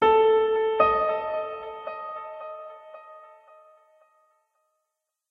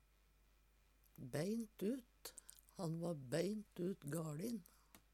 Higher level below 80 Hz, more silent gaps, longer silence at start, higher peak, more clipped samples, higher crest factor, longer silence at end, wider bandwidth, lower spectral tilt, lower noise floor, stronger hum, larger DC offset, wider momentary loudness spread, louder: first, -60 dBFS vs -74 dBFS; neither; second, 0 s vs 1.2 s; first, -6 dBFS vs -28 dBFS; neither; about the same, 20 dB vs 18 dB; first, 2.05 s vs 0.15 s; second, 4.8 kHz vs 17.5 kHz; about the same, -6 dB/octave vs -6 dB/octave; first, -82 dBFS vs -73 dBFS; neither; neither; first, 23 LU vs 14 LU; first, -24 LUFS vs -46 LUFS